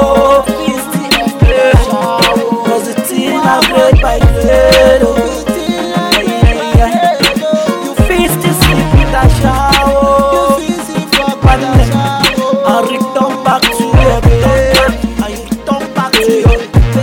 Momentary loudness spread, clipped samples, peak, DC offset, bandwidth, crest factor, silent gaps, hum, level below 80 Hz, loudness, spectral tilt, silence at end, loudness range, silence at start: 7 LU; 0.6%; 0 dBFS; under 0.1%; 18.5 kHz; 10 dB; none; none; -16 dBFS; -10 LUFS; -5 dB/octave; 0 s; 2 LU; 0 s